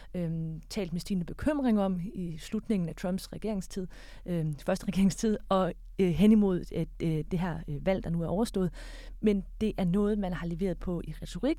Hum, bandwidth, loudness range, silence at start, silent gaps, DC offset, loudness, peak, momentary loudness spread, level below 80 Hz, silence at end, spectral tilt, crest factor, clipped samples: none; 14.5 kHz; 4 LU; 0 s; none; under 0.1%; -31 LUFS; -12 dBFS; 9 LU; -44 dBFS; 0 s; -7 dB/octave; 18 dB; under 0.1%